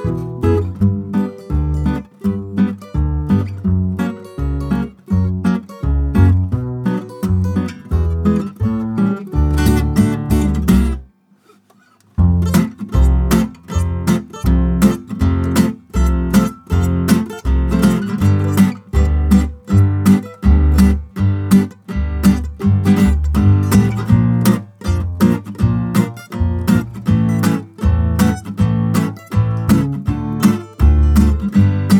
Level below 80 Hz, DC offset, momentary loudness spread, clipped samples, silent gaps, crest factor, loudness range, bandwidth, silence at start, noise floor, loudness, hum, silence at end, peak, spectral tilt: -22 dBFS; under 0.1%; 8 LU; under 0.1%; none; 14 dB; 4 LU; 18 kHz; 0 s; -52 dBFS; -16 LUFS; none; 0 s; 0 dBFS; -7.5 dB/octave